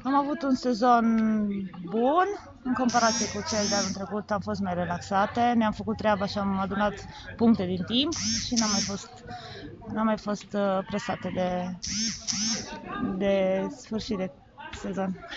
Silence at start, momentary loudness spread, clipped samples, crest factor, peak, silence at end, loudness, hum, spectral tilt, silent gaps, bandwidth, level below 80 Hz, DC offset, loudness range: 0 s; 12 LU; under 0.1%; 20 dB; -8 dBFS; 0 s; -27 LUFS; none; -4 dB/octave; none; 8 kHz; -54 dBFS; under 0.1%; 4 LU